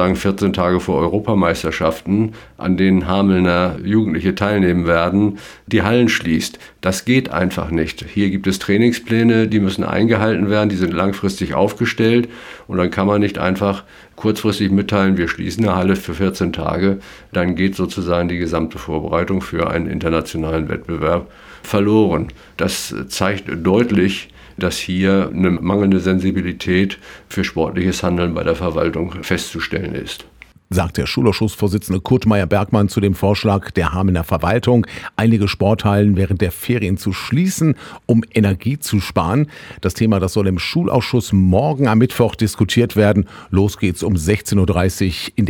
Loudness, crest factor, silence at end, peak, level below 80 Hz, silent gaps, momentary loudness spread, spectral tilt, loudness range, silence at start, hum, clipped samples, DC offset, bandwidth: -17 LUFS; 16 dB; 0 s; 0 dBFS; -38 dBFS; none; 7 LU; -6.5 dB/octave; 4 LU; 0 s; none; under 0.1%; under 0.1%; 17.5 kHz